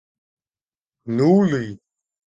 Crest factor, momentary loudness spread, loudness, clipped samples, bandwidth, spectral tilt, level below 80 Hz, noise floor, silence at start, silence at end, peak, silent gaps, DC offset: 18 dB; 18 LU; -19 LUFS; under 0.1%; 7.6 kHz; -8.5 dB/octave; -60 dBFS; under -90 dBFS; 1.05 s; 0.55 s; -6 dBFS; none; under 0.1%